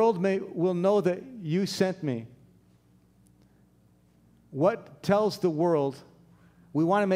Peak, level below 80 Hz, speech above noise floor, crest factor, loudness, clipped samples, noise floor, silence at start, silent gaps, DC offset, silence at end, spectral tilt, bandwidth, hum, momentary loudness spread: -10 dBFS; -70 dBFS; 36 dB; 18 dB; -27 LUFS; under 0.1%; -62 dBFS; 0 s; none; under 0.1%; 0 s; -7 dB/octave; 16 kHz; 60 Hz at -60 dBFS; 10 LU